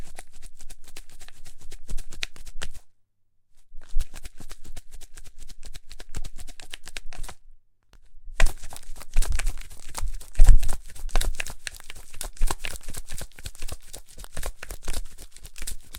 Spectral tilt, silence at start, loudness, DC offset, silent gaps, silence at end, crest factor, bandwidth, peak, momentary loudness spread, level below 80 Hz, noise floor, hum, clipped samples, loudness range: -3 dB/octave; 0 s; -33 LUFS; under 0.1%; none; 0 s; 22 dB; 14 kHz; 0 dBFS; 19 LU; -26 dBFS; -63 dBFS; none; under 0.1%; 14 LU